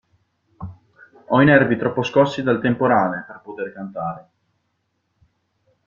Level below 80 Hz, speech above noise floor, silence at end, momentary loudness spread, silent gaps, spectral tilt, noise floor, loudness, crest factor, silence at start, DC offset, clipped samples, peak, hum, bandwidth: -56 dBFS; 53 dB; 1.65 s; 24 LU; none; -7.5 dB/octave; -71 dBFS; -19 LUFS; 20 dB; 0.6 s; under 0.1%; under 0.1%; -2 dBFS; none; 7.4 kHz